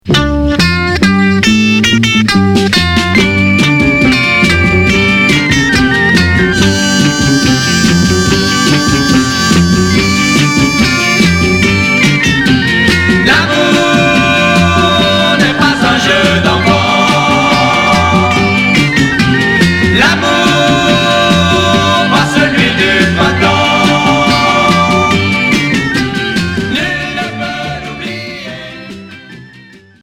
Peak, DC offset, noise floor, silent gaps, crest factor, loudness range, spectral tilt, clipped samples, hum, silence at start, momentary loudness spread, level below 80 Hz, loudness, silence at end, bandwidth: 0 dBFS; under 0.1%; -37 dBFS; none; 10 dB; 3 LU; -4.5 dB/octave; 0.2%; none; 0.05 s; 5 LU; -28 dBFS; -8 LUFS; 0.6 s; 17 kHz